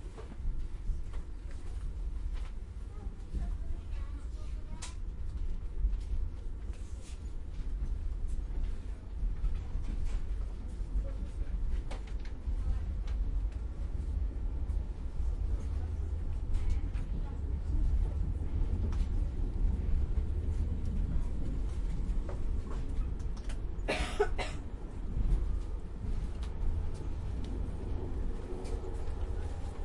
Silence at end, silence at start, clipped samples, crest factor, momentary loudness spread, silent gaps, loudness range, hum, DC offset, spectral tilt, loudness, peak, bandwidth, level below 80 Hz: 0 s; 0 s; under 0.1%; 18 dB; 9 LU; none; 7 LU; none; under 0.1%; -7 dB/octave; -39 LUFS; -16 dBFS; 11 kHz; -34 dBFS